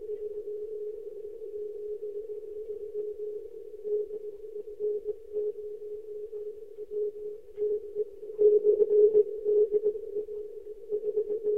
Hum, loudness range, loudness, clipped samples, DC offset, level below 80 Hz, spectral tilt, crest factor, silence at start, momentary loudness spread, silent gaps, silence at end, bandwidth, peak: none; 12 LU; -31 LUFS; under 0.1%; 0.3%; -66 dBFS; -8.5 dB/octave; 18 dB; 0 s; 18 LU; none; 0 s; 1.3 kHz; -12 dBFS